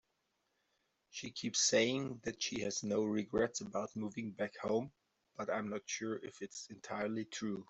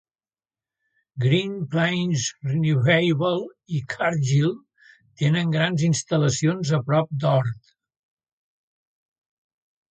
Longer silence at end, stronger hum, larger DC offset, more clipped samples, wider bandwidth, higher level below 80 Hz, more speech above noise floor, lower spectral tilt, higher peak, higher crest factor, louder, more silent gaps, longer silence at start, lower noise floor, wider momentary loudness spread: second, 0.05 s vs 2.35 s; neither; neither; neither; about the same, 8.2 kHz vs 9 kHz; second, -72 dBFS vs -60 dBFS; second, 44 dB vs over 68 dB; second, -3 dB/octave vs -5.5 dB/octave; second, -18 dBFS vs -6 dBFS; about the same, 22 dB vs 18 dB; second, -38 LUFS vs -22 LUFS; neither; about the same, 1.15 s vs 1.15 s; second, -83 dBFS vs under -90 dBFS; first, 14 LU vs 10 LU